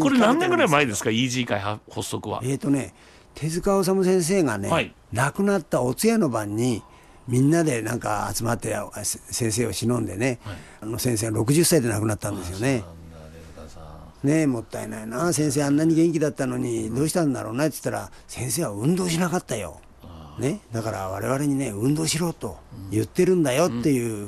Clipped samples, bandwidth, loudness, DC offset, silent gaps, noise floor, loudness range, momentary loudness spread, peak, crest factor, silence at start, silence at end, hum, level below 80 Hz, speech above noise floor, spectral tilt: under 0.1%; 13 kHz; -24 LUFS; under 0.1%; none; -43 dBFS; 4 LU; 14 LU; -6 dBFS; 18 dB; 0 s; 0 s; none; -50 dBFS; 20 dB; -5 dB/octave